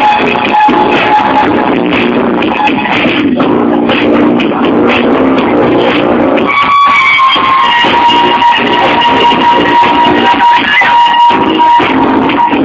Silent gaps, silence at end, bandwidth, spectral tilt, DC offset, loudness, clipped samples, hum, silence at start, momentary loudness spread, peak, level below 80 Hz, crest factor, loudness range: none; 0 s; 8 kHz; -5.5 dB/octave; under 0.1%; -7 LUFS; 0.7%; none; 0 s; 4 LU; 0 dBFS; -38 dBFS; 6 dB; 3 LU